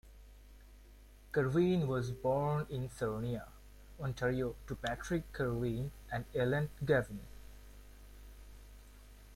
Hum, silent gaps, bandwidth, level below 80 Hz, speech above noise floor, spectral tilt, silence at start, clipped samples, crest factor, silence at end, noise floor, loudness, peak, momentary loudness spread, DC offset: 50 Hz at -55 dBFS; none; 16.5 kHz; -54 dBFS; 22 dB; -7 dB/octave; 0.05 s; under 0.1%; 18 dB; 0 s; -57 dBFS; -36 LUFS; -18 dBFS; 24 LU; under 0.1%